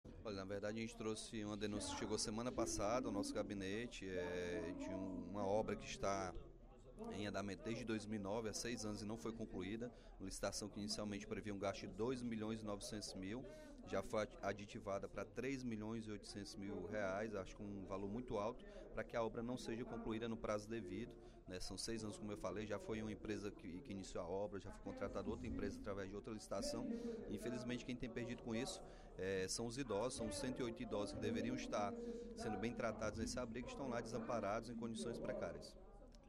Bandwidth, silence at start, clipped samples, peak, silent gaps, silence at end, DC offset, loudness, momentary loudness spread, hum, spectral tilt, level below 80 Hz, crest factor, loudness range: 15 kHz; 0.05 s; under 0.1%; -28 dBFS; none; 0 s; under 0.1%; -47 LUFS; 8 LU; none; -4.5 dB/octave; -62 dBFS; 18 dB; 3 LU